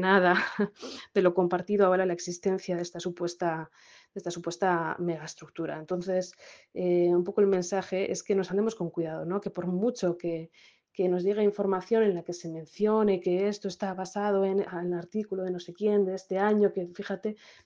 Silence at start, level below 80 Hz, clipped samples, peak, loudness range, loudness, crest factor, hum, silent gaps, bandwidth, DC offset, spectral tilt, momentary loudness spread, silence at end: 0 s; -72 dBFS; under 0.1%; -8 dBFS; 4 LU; -29 LUFS; 22 dB; none; none; 9.4 kHz; under 0.1%; -6 dB/octave; 12 LU; 0.3 s